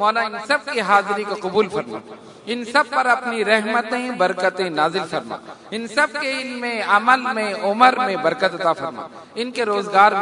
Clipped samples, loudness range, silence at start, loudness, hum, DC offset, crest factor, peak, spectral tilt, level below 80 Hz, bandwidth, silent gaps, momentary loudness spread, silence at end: under 0.1%; 2 LU; 0 s; -19 LUFS; none; under 0.1%; 20 dB; 0 dBFS; -4 dB/octave; -70 dBFS; 11 kHz; none; 14 LU; 0 s